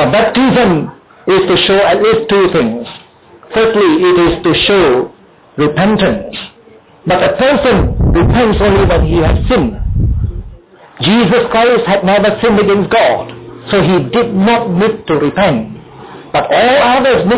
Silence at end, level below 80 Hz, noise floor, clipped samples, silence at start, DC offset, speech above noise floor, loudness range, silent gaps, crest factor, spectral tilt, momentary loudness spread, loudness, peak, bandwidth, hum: 0 s; -24 dBFS; -41 dBFS; under 0.1%; 0 s; under 0.1%; 31 dB; 2 LU; none; 10 dB; -10.5 dB/octave; 11 LU; -10 LUFS; -2 dBFS; 4 kHz; none